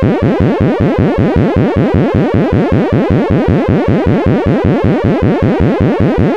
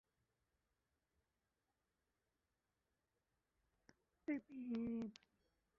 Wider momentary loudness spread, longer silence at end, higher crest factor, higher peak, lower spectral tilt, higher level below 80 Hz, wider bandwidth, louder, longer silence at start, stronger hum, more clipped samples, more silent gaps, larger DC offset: second, 0 LU vs 8 LU; second, 0 s vs 0.65 s; second, 10 dB vs 20 dB; first, 0 dBFS vs -34 dBFS; first, -9.5 dB/octave vs -6 dB/octave; first, -26 dBFS vs -82 dBFS; first, 7.8 kHz vs 5.6 kHz; first, -11 LUFS vs -48 LUFS; second, 0 s vs 4.3 s; neither; neither; neither; first, 0.8% vs under 0.1%